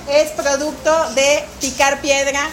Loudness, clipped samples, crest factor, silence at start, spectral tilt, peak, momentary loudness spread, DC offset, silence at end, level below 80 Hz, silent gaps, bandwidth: -16 LUFS; under 0.1%; 16 dB; 0 s; -1.5 dB/octave; 0 dBFS; 4 LU; under 0.1%; 0 s; -44 dBFS; none; 16.5 kHz